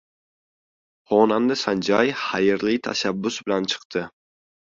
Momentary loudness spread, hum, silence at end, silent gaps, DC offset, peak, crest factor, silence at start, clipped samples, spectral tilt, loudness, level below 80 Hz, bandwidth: 8 LU; none; 0.7 s; 3.85-3.90 s; under 0.1%; -4 dBFS; 20 dB; 1.1 s; under 0.1%; -4.5 dB/octave; -22 LUFS; -62 dBFS; 7.6 kHz